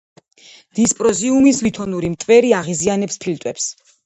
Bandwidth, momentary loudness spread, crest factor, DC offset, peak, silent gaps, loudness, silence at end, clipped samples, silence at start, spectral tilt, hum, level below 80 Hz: 10.5 kHz; 11 LU; 16 dB; under 0.1%; 0 dBFS; none; -17 LUFS; 0.35 s; under 0.1%; 0.75 s; -4.5 dB/octave; none; -52 dBFS